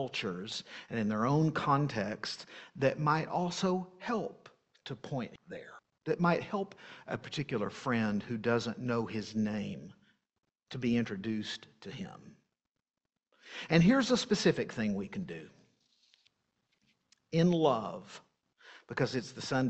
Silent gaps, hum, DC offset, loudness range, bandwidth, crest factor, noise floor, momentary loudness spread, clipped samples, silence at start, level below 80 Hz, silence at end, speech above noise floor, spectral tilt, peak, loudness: none; none; under 0.1%; 6 LU; 8.4 kHz; 24 dB; under -90 dBFS; 18 LU; under 0.1%; 0 s; -66 dBFS; 0 s; over 57 dB; -6 dB/octave; -10 dBFS; -33 LUFS